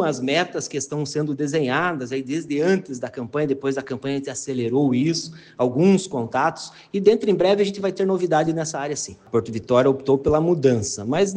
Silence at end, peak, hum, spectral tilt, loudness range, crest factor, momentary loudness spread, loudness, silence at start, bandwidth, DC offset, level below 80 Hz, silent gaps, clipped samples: 0 s; -4 dBFS; none; -5.5 dB/octave; 4 LU; 18 dB; 9 LU; -22 LUFS; 0 s; 10 kHz; under 0.1%; -54 dBFS; none; under 0.1%